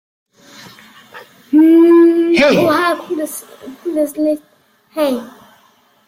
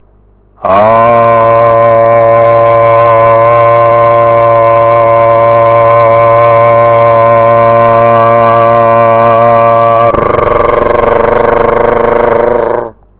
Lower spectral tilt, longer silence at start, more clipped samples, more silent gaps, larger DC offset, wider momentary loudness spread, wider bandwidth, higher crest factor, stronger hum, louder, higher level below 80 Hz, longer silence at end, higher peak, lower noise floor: second, -5 dB/octave vs -10.5 dB/octave; first, 1.15 s vs 0.6 s; second, under 0.1% vs 2%; neither; neither; first, 18 LU vs 3 LU; first, 15.5 kHz vs 4 kHz; first, 14 dB vs 6 dB; neither; second, -13 LUFS vs -6 LUFS; second, -56 dBFS vs -32 dBFS; first, 0.8 s vs 0.3 s; about the same, -2 dBFS vs 0 dBFS; first, -53 dBFS vs -43 dBFS